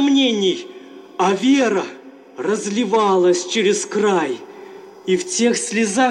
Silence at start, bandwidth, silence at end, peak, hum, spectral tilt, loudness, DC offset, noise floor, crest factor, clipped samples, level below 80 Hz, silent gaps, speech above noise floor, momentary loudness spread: 0 s; 11.5 kHz; 0 s; -6 dBFS; none; -3.5 dB/octave; -18 LUFS; under 0.1%; -38 dBFS; 12 dB; under 0.1%; -70 dBFS; none; 21 dB; 16 LU